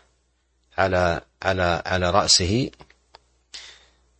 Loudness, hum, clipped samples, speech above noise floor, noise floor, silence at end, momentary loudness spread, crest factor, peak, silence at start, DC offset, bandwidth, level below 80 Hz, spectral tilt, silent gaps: -21 LUFS; none; under 0.1%; 46 dB; -67 dBFS; 0.5 s; 23 LU; 22 dB; -4 dBFS; 0.8 s; under 0.1%; 8.8 kHz; -46 dBFS; -3 dB/octave; none